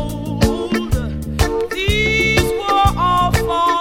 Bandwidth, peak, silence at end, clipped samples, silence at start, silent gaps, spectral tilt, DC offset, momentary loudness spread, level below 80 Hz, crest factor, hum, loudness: 18 kHz; 0 dBFS; 0 s; under 0.1%; 0 s; none; -5 dB/octave; under 0.1%; 7 LU; -26 dBFS; 16 dB; none; -17 LUFS